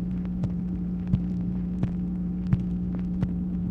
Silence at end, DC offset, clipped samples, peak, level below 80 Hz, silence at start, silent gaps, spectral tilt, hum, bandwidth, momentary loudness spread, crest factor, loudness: 0 s; under 0.1%; under 0.1%; -10 dBFS; -38 dBFS; 0 s; none; -11 dB/octave; none; 3.7 kHz; 3 LU; 18 dB; -29 LUFS